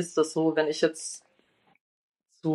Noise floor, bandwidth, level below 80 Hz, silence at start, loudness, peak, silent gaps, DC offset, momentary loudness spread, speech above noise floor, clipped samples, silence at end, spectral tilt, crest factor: -67 dBFS; 12 kHz; -84 dBFS; 0 s; -27 LUFS; -10 dBFS; 1.81-2.12 s; under 0.1%; 12 LU; 40 dB; under 0.1%; 0 s; -4.5 dB/octave; 20 dB